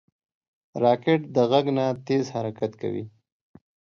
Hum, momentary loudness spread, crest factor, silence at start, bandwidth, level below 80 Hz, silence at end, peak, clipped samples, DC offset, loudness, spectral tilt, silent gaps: none; 12 LU; 20 dB; 0.75 s; 7.2 kHz; -68 dBFS; 0.9 s; -6 dBFS; under 0.1%; under 0.1%; -24 LUFS; -7 dB/octave; none